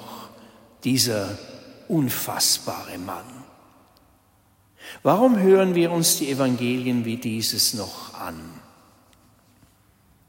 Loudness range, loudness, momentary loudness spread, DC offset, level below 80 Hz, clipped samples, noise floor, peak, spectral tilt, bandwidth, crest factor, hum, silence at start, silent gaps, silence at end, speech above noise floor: 6 LU; -21 LUFS; 22 LU; under 0.1%; -64 dBFS; under 0.1%; -60 dBFS; -4 dBFS; -4 dB/octave; 16.5 kHz; 20 dB; none; 0 s; none; 1.7 s; 37 dB